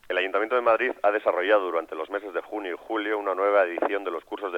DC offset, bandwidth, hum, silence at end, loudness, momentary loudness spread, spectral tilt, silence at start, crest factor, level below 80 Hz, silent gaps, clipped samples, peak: under 0.1%; 7 kHz; none; 0 s; -25 LUFS; 10 LU; -4.5 dB/octave; 0.1 s; 18 dB; -72 dBFS; none; under 0.1%; -8 dBFS